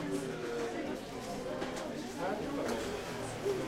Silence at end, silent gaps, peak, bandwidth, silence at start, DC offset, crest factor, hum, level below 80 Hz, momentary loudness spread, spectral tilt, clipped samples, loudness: 0 s; none; -22 dBFS; 16 kHz; 0 s; under 0.1%; 16 dB; none; -58 dBFS; 4 LU; -4.5 dB/octave; under 0.1%; -38 LUFS